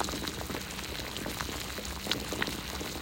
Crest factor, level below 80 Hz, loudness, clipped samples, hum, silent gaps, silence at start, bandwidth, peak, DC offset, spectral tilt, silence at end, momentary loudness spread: 26 dB; -48 dBFS; -35 LUFS; under 0.1%; none; none; 0 s; 16.5 kHz; -10 dBFS; under 0.1%; -3 dB/octave; 0 s; 4 LU